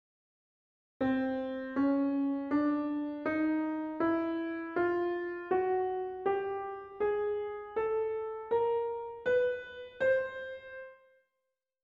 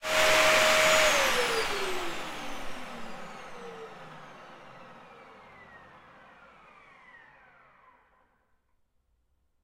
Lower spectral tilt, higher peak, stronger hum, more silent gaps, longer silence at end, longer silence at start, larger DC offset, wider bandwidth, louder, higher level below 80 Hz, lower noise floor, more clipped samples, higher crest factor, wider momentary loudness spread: first, -8 dB/octave vs -1 dB/octave; second, -18 dBFS vs -8 dBFS; neither; neither; second, 0.9 s vs 3.85 s; first, 1 s vs 0 s; neither; second, 5.2 kHz vs 16 kHz; second, -33 LUFS vs -24 LUFS; second, -68 dBFS vs -54 dBFS; first, -86 dBFS vs -72 dBFS; neither; second, 14 dB vs 22 dB; second, 9 LU vs 27 LU